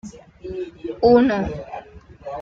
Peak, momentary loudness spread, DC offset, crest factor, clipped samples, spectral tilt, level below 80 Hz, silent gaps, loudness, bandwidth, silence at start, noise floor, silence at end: -4 dBFS; 24 LU; under 0.1%; 18 dB; under 0.1%; -7 dB/octave; -44 dBFS; none; -19 LUFS; 7.4 kHz; 0.05 s; -40 dBFS; 0 s